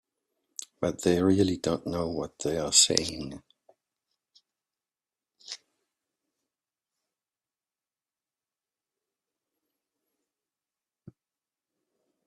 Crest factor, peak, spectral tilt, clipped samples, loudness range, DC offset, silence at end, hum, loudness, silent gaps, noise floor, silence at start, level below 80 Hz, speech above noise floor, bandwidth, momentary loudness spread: 32 dB; -2 dBFS; -3.5 dB/octave; under 0.1%; 15 LU; under 0.1%; 6.7 s; none; -26 LUFS; none; under -90 dBFS; 0.8 s; -62 dBFS; over 63 dB; 14.5 kHz; 22 LU